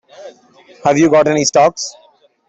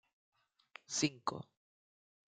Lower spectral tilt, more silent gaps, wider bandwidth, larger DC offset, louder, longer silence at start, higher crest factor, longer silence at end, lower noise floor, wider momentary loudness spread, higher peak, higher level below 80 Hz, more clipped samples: about the same, -4 dB/octave vs -3 dB/octave; neither; second, 8.4 kHz vs 10 kHz; neither; first, -12 LUFS vs -38 LUFS; second, 0.2 s vs 0.9 s; second, 12 dB vs 26 dB; second, 0.55 s vs 0.95 s; second, -45 dBFS vs -62 dBFS; second, 12 LU vs 22 LU; first, -2 dBFS vs -18 dBFS; first, -56 dBFS vs -82 dBFS; neither